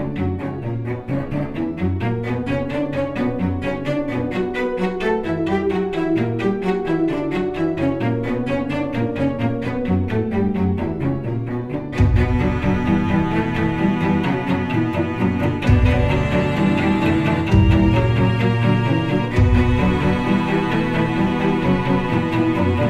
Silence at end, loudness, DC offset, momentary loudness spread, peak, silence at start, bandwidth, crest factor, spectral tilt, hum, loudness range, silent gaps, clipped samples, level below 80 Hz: 0 s; -20 LUFS; under 0.1%; 7 LU; -2 dBFS; 0 s; 9.8 kHz; 16 dB; -8.5 dB/octave; none; 5 LU; none; under 0.1%; -30 dBFS